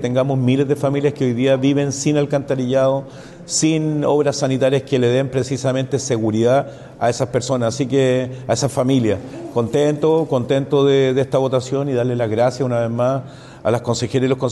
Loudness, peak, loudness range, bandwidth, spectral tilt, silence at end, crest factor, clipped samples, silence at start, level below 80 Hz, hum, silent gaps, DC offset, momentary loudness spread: -18 LUFS; -6 dBFS; 2 LU; 12 kHz; -6 dB/octave; 0 s; 12 dB; under 0.1%; 0 s; -52 dBFS; none; none; under 0.1%; 5 LU